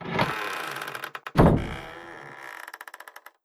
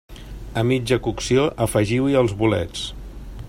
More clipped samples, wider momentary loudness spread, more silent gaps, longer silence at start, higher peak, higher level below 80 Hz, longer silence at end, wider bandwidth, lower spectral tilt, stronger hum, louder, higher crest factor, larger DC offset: neither; about the same, 21 LU vs 20 LU; neither; about the same, 0 s vs 0.1 s; about the same, -4 dBFS vs -4 dBFS; about the same, -38 dBFS vs -38 dBFS; first, 0.25 s vs 0 s; about the same, 16 kHz vs 16 kHz; about the same, -6.5 dB/octave vs -6 dB/octave; neither; second, -26 LUFS vs -21 LUFS; first, 24 dB vs 16 dB; neither